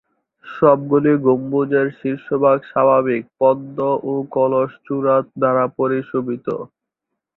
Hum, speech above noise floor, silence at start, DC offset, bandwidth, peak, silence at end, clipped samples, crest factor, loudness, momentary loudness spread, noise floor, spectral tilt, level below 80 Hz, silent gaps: none; 63 dB; 0.45 s; under 0.1%; 4.1 kHz; -2 dBFS; 0.7 s; under 0.1%; 16 dB; -18 LUFS; 9 LU; -80 dBFS; -11 dB/octave; -62 dBFS; none